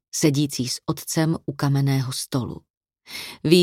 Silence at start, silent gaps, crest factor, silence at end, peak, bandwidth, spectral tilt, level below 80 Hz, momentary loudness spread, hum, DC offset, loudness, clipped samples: 0.15 s; 2.70-2.81 s; 20 dB; 0 s; -2 dBFS; 16.5 kHz; -5 dB/octave; -58 dBFS; 14 LU; none; under 0.1%; -23 LUFS; under 0.1%